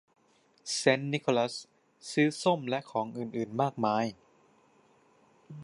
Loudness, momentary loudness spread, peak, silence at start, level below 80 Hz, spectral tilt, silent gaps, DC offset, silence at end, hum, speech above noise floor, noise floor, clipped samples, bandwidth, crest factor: -30 LUFS; 12 LU; -8 dBFS; 0.65 s; -78 dBFS; -4.5 dB/octave; none; under 0.1%; 0 s; none; 37 dB; -67 dBFS; under 0.1%; 11.5 kHz; 24 dB